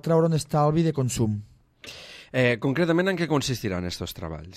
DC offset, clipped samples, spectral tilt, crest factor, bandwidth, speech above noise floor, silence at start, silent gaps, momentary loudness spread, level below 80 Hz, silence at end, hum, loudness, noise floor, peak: under 0.1%; under 0.1%; -6 dB/octave; 16 dB; 15.5 kHz; 22 dB; 0.05 s; none; 18 LU; -50 dBFS; 0 s; none; -25 LUFS; -45 dBFS; -10 dBFS